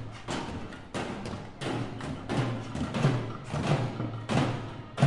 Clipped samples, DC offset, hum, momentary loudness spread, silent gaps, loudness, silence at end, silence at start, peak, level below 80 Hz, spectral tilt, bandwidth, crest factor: under 0.1%; under 0.1%; none; 10 LU; none; -33 LUFS; 0 s; 0 s; -10 dBFS; -52 dBFS; -6.5 dB/octave; 11.5 kHz; 22 dB